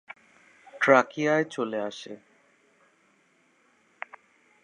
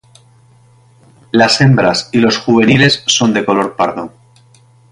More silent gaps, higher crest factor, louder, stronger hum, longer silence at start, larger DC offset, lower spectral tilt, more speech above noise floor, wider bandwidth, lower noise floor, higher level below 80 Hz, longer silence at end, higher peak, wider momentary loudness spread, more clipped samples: neither; first, 26 dB vs 14 dB; second, -25 LUFS vs -11 LUFS; neither; second, 0.75 s vs 1.35 s; neither; about the same, -5 dB/octave vs -4.5 dB/octave; first, 41 dB vs 35 dB; second, 10 kHz vs 11.5 kHz; first, -65 dBFS vs -46 dBFS; second, -86 dBFS vs -48 dBFS; first, 2.5 s vs 0.85 s; second, -4 dBFS vs 0 dBFS; first, 26 LU vs 8 LU; neither